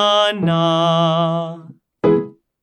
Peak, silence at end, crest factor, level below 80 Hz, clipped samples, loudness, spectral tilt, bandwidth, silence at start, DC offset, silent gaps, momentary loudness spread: -4 dBFS; 0.3 s; 14 dB; -56 dBFS; under 0.1%; -17 LUFS; -6 dB/octave; 10 kHz; 0 s; under 0.1%; none; 14 LU